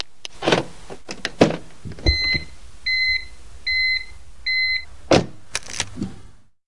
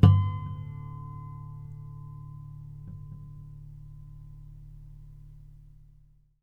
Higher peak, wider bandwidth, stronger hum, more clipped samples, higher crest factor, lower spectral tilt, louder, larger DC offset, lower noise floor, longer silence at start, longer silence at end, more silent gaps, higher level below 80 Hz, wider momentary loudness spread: first, 0 dBFS vs -4 dBFS; first, 11.5 kHz vs 4.2 kHz; neither; neither; about the same, 22 dB vs 26 dB; second, -3.5 dB/octave vs -10 dB/octave; first, -21 LUFS vs -34 LUFS; first, 2% vs under 0.1%; second, -44 dBFS vs -59 dBFS; first, 0.35 s vs 0 s; second, 0 s vs 0.6 s; neither; first, -36 dBFS vs -48 dBFS; about the same, 17 LU vs 16 LU